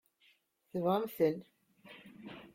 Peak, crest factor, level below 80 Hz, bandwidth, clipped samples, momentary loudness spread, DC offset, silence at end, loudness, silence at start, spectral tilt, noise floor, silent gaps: -18 dBFS; 20 dB; -78 dBFS; 16.5 kHz; under 0.1%; 22 LU; under 0.1%; 0.1 s; -35 LUFS; 0.75 s; -7.5 dB/octave; -71 dBFS; none